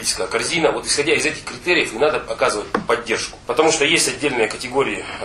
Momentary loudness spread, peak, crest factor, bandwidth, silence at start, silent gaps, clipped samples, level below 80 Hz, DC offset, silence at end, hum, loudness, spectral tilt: 7 LU; 0 dBFS; 20 dB; 13.5 kHz; 0 s; none; under 0.1%; -46 dBFS; under 0.1%; 0 s; none; -18 LUFS; -2 dB/octave